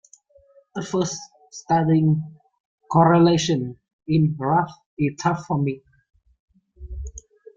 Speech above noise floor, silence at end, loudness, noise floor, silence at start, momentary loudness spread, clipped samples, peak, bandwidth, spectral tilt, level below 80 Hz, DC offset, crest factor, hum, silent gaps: 36 dB; 0.35 s; -21 LUFS; -56 dBFS; 0.75 s; 21 LU; under 0.1%; -4 dBFS; 7.6 kHz; -6.5 dB/octave; -46 dBFS; under 0.1%; 18 dB; none; 2.60-2.78 s, 3.93-3.99 s, 4.86-4.97 s, 6.40-6.48 s